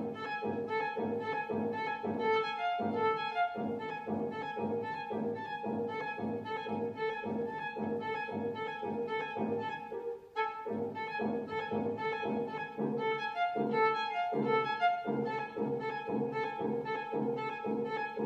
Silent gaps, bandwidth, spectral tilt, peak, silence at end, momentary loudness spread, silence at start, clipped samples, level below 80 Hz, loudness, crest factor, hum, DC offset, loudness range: none; 7.6 kHz; -7 dB/octave; -18 dBFS; 0 s; 6 LU; 0 s; under 0.1%; -76 dBFS; -35 LUFS; 18 dB; none; under 0.1%; 4 LU